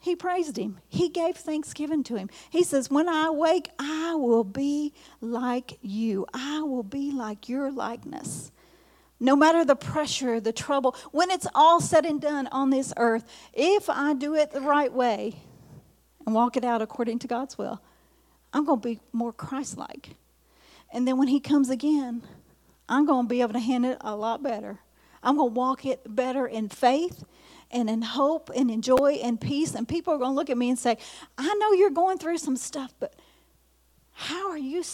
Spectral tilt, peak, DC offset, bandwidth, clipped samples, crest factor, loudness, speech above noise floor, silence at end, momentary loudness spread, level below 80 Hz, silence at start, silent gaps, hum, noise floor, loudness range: -4.5 dB/octave; -6 dBFS; under 0.1%; 16 kHz; under 0.1%; 20 dB; -26 LUFS; 38 dB; 0 s; 12 LU; -64 dBFS; 0.05 s; none; none; -63 dBFS; 7 LU